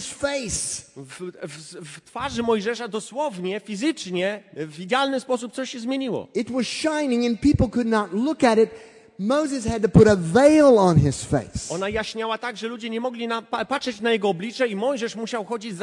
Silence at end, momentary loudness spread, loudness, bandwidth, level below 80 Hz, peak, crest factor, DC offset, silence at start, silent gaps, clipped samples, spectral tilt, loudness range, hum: 0 s; 15 LU; -22 LUFS; 11.5 kHz; -46 dBFS; -4 dBFS; 18 dB; under 0.1%; 0 s; none; under 0.1%; -5.5 dB/octave; 9 LU; none